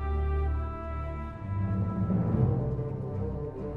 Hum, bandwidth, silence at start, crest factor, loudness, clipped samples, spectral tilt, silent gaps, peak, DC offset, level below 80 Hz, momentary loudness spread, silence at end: none; 4.1 kHz; 0 s; 16 dB; -31 LUFS; under 0.1%; -11 dB/octave; none; -14 dBFS; under 0.1%; -36 dBFS; 9 LU; 0 s